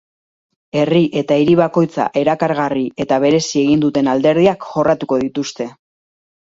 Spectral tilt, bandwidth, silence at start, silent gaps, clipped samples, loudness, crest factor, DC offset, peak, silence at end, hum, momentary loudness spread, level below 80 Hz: -6 dB/octave; 7.8 kHz; 0.75 s; none; under 0.1%; -15 LUFS; 16 dB; under 0.1%; 0 dBFS; 0.85 s; none; 8 LU; -54 dBFS